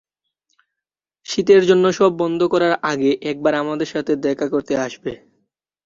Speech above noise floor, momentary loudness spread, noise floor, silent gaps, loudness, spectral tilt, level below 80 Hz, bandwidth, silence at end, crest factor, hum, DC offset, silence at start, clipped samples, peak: 69 dB; 12 LU; -87 dBFS; none; -18 LUFS; -5.5 dB/octave; -60 dBFS; 7.6 kHz; 0.7 s; 18 dB; none; under 0.1%; 1.3 s; under 0.1%; -2 dBFS